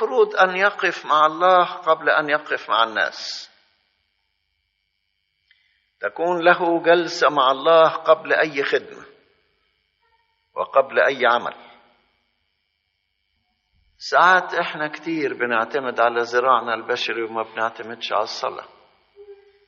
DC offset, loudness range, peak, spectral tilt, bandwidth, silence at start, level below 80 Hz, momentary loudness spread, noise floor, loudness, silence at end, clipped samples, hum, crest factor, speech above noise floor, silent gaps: under 0.1%; 8 LU; -2 dBFS; -0.5 dB/octave; 7.2 kHz; 0 s; -74 dBFS; 12 LU; -73 dBFS; -19 LUFS; 0.35 s; under 0.1%; none; 20 dB; 53 dB; none